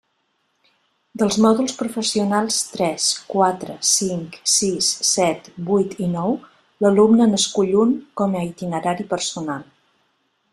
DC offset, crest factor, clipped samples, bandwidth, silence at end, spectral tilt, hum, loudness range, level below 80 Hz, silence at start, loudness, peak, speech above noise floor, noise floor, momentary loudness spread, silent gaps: under 0.1%; 18 dB; under 0.1%; 13.5 kHz; 0.9 s; -3.5 dB/octave; none; 2 LU; -60 dBFS; 1.15 s; -19 LUFS; -2 dBFS; 50 dB; -69 dBFS; 9 LU; none